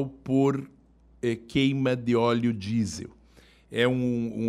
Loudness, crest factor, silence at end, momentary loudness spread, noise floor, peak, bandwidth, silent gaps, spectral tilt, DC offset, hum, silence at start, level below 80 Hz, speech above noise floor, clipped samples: -26 LUFS; 18 dB; 0 s; 10 LU; -56 dBFS; -10 dBFS; 12 kHz; none; -6.5 dB/octave; under 0.1%; none; 0 s; -58 dBFS; 31 dB; under 0.1%